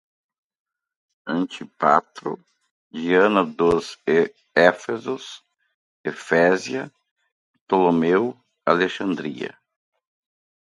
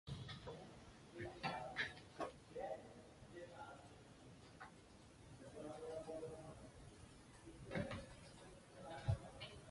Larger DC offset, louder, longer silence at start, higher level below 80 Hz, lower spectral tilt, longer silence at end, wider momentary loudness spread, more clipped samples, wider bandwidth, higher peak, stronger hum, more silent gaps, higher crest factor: neither; first, -21 LUFS vs -52 LUFS; first, 1.25 s vs 0.05 s; first, -60 dBFS vs -66 dBFS; about the same, -5.5 dB/octave vs -5.5 dB/octave; first, 1.3 s vs 0 s; about the same, 15 LU vs 16 LU; neither; about the same, 11.5 kHz vs 11.5 kHz; first, 0 dBFS vs -28 dBFS; neither; first, 2.71-2.91 s, 5.74-6.04 s, 7.11-7.16 s, 7.32-7.54 s, 7.61-7.67 s vs none; about the same, 22 dB vs 24 dB